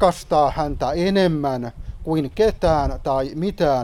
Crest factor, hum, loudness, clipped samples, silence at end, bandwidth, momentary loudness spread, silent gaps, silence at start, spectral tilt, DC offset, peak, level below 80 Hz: 18 dB; none; -21 LUFS; under 0.1%; 0 s; 15 kHz; 7 LU; none; 0 s; -6.5 dB/octave; under 0.1%; -2 dBFS; -34 dBFS